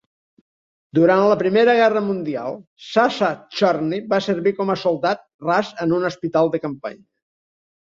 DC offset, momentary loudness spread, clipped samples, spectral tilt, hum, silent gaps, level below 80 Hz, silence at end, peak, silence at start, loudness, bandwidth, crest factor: under 0.1%; 11 LU; under 0.1%; -6.5 dB/octave; none; 2.67-2.76 s, 5.34-5.39 s; -64 dBFS; 1 s; -2 dBFS; 0.95 s; -19 LUFS; 7.6 kHz; 18 dB